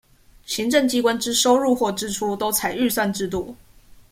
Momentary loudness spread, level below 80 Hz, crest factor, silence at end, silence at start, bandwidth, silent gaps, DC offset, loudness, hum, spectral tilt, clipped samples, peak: 10 LU; -52 dBFS; 18 dB; 0.2 s; 0.5 s; 16.5 kHz; none; under 0.1%; -21 LUFS; none; -3 dB/octave; under 0.1%; -4 dBFS